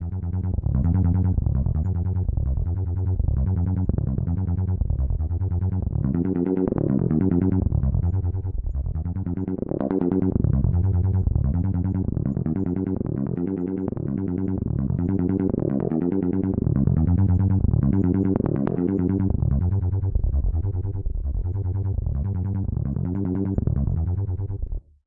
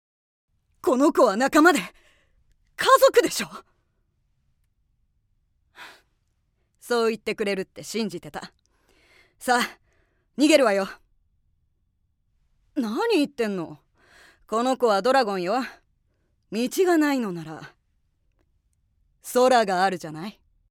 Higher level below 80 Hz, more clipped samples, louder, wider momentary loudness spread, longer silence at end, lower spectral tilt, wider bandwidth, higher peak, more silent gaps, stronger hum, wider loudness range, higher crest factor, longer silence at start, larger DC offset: first, -30 dBFS vs -64 dBFS; neither; about the same, -24 LUFS vs -22 LUFS; second, 7 LU vs 18 LU; second, 0.25 s vs 0.4 s; first, -14 dB/octave vs -4 dB/octave; second, 2.4 kHz vs 18 kHz; about the same, -4 dBFS vs -4 dBFS; neither; neither; second, 4 LU vs 9 LU; about the same, 18 dB vs 22 dB; second, 0 s vs 0.85 s; neither